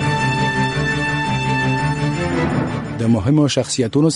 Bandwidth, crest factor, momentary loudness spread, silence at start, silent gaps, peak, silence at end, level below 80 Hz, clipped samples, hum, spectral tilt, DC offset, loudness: 11.5 kHz; 14 dB; 4 LU; 0 s; none; -4 dBFS; 0 s; -38 dBFS; under 0.1%; none; -5.5 dB/octave; under 0.1%; -18 LUFS